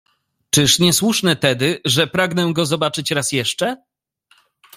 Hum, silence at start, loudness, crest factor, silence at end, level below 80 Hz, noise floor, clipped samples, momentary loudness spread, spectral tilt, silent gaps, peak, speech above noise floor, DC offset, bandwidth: none; 0.55 s; -17 LUFS; 18 dB; 1 s; -54 dBFS; -59 dBFS; under 0.1%; 7 LU; -3.5 dB/octave; none; 0 dBFS; 42 dB; under 0.1%; 16 kHz